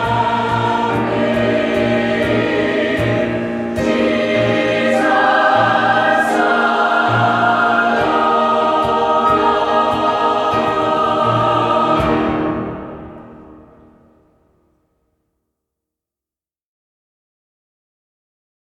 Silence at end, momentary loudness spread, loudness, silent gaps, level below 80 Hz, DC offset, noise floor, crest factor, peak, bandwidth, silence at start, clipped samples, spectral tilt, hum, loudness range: 5.15 s; 5 LU; -15 LUFS; none; -44 dBFS; under 0.1%; under -90 dBFS; 16 dB; -2 dBFS; 13.5 kHz; 0 s; under 0.1%; -6 dB/octave; none; 6 LU